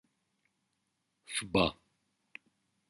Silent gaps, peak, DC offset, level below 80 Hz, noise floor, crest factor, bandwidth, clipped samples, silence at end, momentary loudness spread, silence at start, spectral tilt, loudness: none; -14 dBFS; under 0.1%; -60 dBFS; -82 dBFS; 26 dB; 11.5 kHz; under 0.1%; 1.15 s; 23 LU; 1.3 s; -4 dB/octave; -32 LUFS